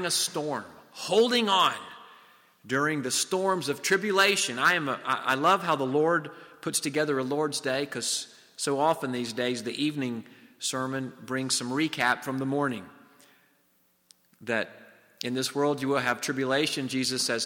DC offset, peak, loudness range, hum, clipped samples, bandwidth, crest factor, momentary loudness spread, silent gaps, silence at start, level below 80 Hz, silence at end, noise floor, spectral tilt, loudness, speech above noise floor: under 0.1%; -10 dBFS; 6 LU; none; under 0.1%; 17 kHz; 18 dB; 11 LU; none; 0 s; -74 dBFS; 0 s; -68 dBFS; -3 dB/octave; -27 LUFS; 40 dB